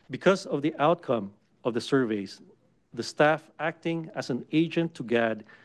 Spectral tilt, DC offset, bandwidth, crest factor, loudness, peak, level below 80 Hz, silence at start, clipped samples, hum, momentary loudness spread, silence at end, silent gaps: -6 dB/octave; under 0.1%; 12 kHz; 20 dB; -28 LUFS; -8 dBFS; -72 dBFS; 0.1 s; under 0.1%; none; 10 LU; 0.2 s; none